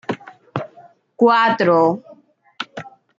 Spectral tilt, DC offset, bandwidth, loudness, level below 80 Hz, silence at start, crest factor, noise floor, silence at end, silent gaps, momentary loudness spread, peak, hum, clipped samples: -6.5 dB/octave; under 0.1%; 7.6 kHz; -17 LUFS; -70 dBFS; 0.1 s; 18 dB; -49 dBFS; 0.3 s; none; 18 LU; -2 dBFS; none; under 0.1%